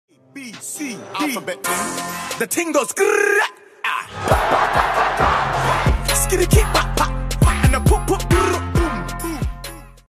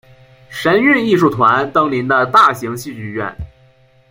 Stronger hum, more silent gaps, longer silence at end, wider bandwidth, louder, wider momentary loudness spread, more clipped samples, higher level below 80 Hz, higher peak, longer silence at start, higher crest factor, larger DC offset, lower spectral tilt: neither; neither; second, 0.2 s vs 0.65 s; about the same, 15.5 kHz vs 16.5 kHz; second, -19 LUFS vs -13 LUFS; second, 11 LU vs 15 LU; neither; first, -26 dBFS vs -46 dBFS; about the same, -2 dBFS vs 0 dBFS; second, 0.35 s vs 0.5 s; about the same, 18 dB vs 14 dB; neither; about the same, -4.5 dB/octave vs -5.5 dB/octave